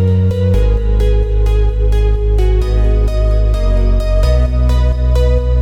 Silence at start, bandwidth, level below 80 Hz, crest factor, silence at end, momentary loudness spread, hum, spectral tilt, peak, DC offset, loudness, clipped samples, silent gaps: 0 s; 6.6 kHz; -12 dBFS; 10 dB; 0 s; 2 LU; none; -8 dB/octave; -2 dBFS; under 0.1%; -14 LUFS; under 0.1%; none